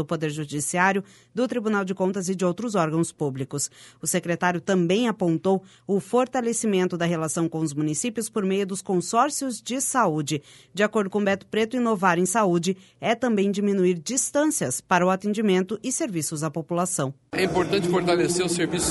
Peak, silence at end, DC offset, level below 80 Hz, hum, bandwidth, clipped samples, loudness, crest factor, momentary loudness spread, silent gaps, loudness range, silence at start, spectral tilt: -6 dBFS; 0 s; under 0.1%; -58 dBFS; none; 12 kHz; under 0.1%; -24 LUFS; 18 dB; 7 LU; none; 2 LU; 0 s; -4.5 dB/octave